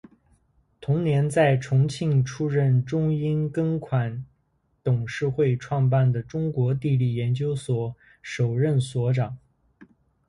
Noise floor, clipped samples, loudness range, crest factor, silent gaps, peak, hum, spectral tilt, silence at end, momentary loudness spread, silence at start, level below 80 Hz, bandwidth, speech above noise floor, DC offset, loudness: -69 dBFS; under 0.1%; 3 LU; 16 dB; none; -8 dBFS; none; -7.5 dB/octave; 0.45 s; 9 LU; 0.8 s; -56 dBFS; 11 kHz; 46 dB; under 0.1%; -24 LUFS